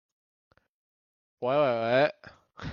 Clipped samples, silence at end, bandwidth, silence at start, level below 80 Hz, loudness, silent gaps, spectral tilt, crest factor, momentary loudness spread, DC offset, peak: under 0.1%; 0 s; 6.6 kHz; 1.4 s; -66 dBFS; -27 LUFS; none; -7 dB/octave; 20 dB; 10 LU; under 0.1%; -10 dBFS